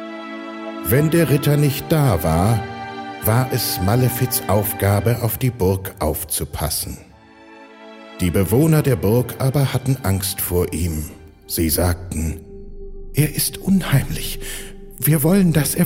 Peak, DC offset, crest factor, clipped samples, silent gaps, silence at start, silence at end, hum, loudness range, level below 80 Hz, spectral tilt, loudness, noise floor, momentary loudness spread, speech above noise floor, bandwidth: -2 dBFS; under 0.1%; 16 dB; under 0.1%; none; 0 s; 0 s; none; 4 LU; -38 dBFS; -5.5 dB/octave; -19 LUFS; -44 dBFS; 15 LU; 26 dB; 16.5 kHz